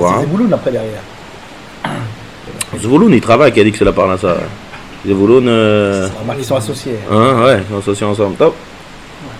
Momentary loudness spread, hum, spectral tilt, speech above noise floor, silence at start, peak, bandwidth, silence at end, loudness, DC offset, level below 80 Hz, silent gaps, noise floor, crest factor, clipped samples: 22 LU; none; -6 dB/octave; 21 dB; 0 s; 0 dBFS; 15.5 kHz; 0 s; -12 LUFS; 0.6%; -38 dBFS; none; -33 dBFS; 12 dB; 0.2%